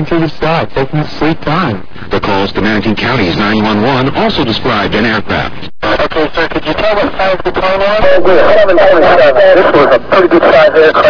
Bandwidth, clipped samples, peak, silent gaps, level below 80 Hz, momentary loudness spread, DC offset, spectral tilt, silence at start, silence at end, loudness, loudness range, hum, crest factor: 5.4 kHz; 3%; 0 dBFS; none; -30 dBFS; 9 LU; under 0.1%; -7 dB/octave; 0 s; 0 s; -9 LUFS; 6 LU; none; 8 dB